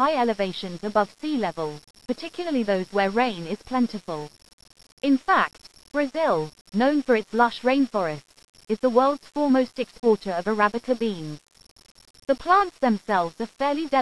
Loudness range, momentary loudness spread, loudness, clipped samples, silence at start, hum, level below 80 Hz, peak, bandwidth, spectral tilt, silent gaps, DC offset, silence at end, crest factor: 3 LU; 12 LU; -24 LUFS; under 0.1%; 0 s; none; -58 dBFS; -6 dBFS; 11 kHz; -6 dB/octave; 4.53-4.58 s, 4.92-4.97 s, 6.61-6.65 s, 8.49-8.53 s, 11.71-11.76 s; 0.3%; 0 s; 20 dB